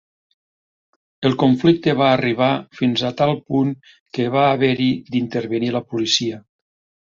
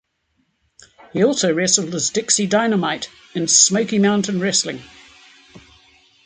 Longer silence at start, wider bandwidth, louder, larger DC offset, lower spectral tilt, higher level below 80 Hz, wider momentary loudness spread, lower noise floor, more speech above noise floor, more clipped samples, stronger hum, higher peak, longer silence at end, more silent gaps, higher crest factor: about the same, 1.2 s vs 1.15 s; second, 7.6 kHz vs 9.6 kHz; about the same, -19 LUFS vs -17 LUFS; neither; first, -5.5 dB/octave vs -3 dB/octave; about the same, -58 dBFS vs -60 dBFS; second, 7 LU vs 15 LU; first, under -90 dBFS vs -68 dBFS; first, over 72 dB vs 49 dB; neither; neither; about the same, -2 dBFS vs 0 dBFS; about the same, 0.65 s vs 0.65 s; first, 4.00-4.06 s vs none; about the same, 18 dB vs 20 dB